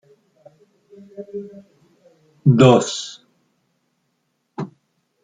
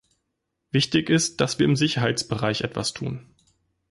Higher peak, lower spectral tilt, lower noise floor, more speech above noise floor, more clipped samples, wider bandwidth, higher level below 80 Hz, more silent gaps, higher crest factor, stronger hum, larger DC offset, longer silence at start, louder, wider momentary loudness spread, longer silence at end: first, -2 dBFS vs -8 dBFS; first, -6.5 dB/octave vs -4.5 dB/octave; second, -71 dBFS vs -79 dBFS; about the same, 55 dB vs 55 dB; neither; second, 9.4 kHz vs 11.5 kHz; about the same, -60 dBFS vs -56 dBFS; neither; about the same, 20 dB vs 18 dB; neither; neither; first, 1.2 s vs 0.75 s; first, -15 LUFS vs -23 LUFS; first, 26 LU vs 9 LU; second, 0.55 s vs 0.7 s